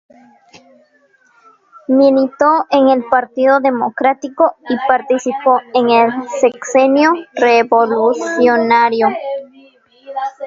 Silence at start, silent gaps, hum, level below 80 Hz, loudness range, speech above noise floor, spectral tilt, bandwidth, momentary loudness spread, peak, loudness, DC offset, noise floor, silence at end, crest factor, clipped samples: 1.9 s; none; none; -62 dBFS; 2 LU; 41 dB; -4 dB/octave; 7.8 kHz; 6 LU; 0 dBFS; -13 LUFS; under 0.1%; -54 dBFS; 0 s; 14 dB; under 0.1%